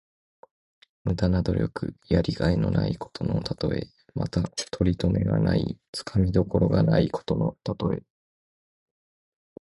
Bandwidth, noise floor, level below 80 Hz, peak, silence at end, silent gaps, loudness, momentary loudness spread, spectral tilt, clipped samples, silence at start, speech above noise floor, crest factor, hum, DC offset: 11.5 kHz; under -90 dBFS; -40 dBFS; -8 dBFS; 1.65 s; 5.88-5.93 s; -26 LUFS; 9 LU; -7.5 dB/octave; under 0.1%; 1.05 s; over 65 dB; 18 dB; none; under 0.1%